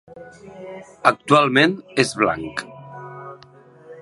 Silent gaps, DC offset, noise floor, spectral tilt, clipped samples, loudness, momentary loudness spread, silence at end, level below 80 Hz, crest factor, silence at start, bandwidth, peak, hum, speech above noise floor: none; under 0.1%; -48 dBFS; -4.5 dB/octave; under 0.1%; -18 LUFS; 24 LU; 0 s; -58 dBFS; 22 dB; 0.15 s; 11.5 kHz; 0 dBFS; none; 28 dB